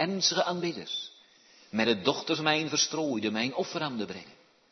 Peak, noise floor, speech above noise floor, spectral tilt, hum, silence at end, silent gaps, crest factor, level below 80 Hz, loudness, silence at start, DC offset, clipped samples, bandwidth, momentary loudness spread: -8 dBFS; -59 dBFS; 29 dB; -3 dB/octave; none; 0.4 s; none; 22 dB; -76 dBFS; -29 LUFS; 0 s; under 0.1%; under 0.1%; 6.4 kHz; 11 LU